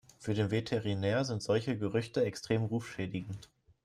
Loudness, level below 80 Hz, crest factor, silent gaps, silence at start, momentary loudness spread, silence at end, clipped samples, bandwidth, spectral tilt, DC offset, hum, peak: -34 LUFS; -66 dBFS; 16 dB; none; 0.2 s; 7 LU; 0.4 s; under 0.1%; 12.5 kHz; -6.5 dB/octave; under 0.1%; none; -16 dBFS